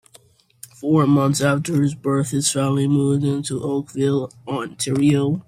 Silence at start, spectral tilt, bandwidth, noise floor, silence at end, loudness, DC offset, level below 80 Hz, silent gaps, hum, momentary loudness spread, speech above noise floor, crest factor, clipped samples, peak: 0.8 s; -6 dB/octave; 15.5 kHz; -53 dBFS; 0.05 s; -20 LUFS; under 0.1%; -58 dBFS; none; none; 8 LU; 34 dB; 16 dB; under 0.1%; -4 dBFS